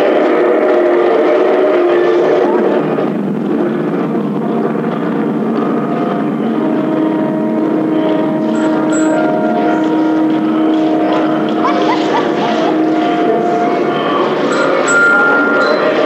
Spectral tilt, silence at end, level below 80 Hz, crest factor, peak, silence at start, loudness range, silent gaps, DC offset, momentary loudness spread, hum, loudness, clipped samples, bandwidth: -6 dB/octave; 0 s; -64 dBFS; 12 dB; 0 dBFS; 0 s; 4 LU; none; under 0.1%; 5 LU; none; -13 LUFS; under 0.1%; 8.4 kHz